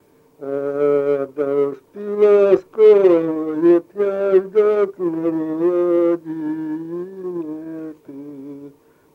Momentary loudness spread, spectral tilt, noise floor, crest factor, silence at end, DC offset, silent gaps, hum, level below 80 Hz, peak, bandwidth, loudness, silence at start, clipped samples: 19 LU; -8.5 dB/octave; -44 dBFS; 16 dB; 0.45 s; under 0.1%; none; none; -70 dBFS; -2 dBFS; 4.6 kHz; -18 LUFS; 0.4 s; under 0.1%